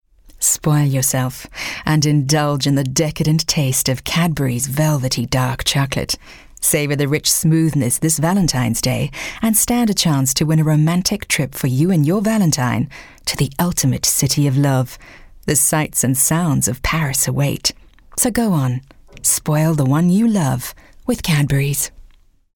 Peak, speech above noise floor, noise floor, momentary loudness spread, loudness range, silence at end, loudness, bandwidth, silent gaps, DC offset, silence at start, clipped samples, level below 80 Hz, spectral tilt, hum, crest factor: -2 dBFS; 31 dB; -47 dBFS; 7 LU; 2 LU; 0.5 s; -17 LUFS; 19 kHz; none; under 0.1%; 0.35 s; under 0.1%; -40 dBFS; -4.5 dB/octave; none; 14 dB